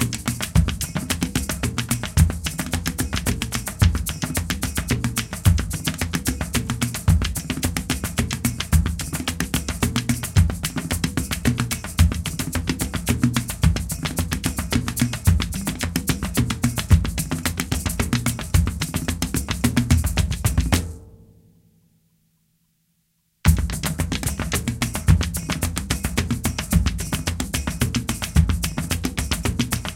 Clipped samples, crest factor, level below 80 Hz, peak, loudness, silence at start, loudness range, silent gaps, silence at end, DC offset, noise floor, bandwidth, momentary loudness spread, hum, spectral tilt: under 0.1%; 20 dB; -28 dBFS; -2 dBFS; -23 LUFS; 0 s; 2 LU; none; 0 s; under 0.1%; -68 dBFS; 17 kHz; 5 LU; none; -4.5 dB/octave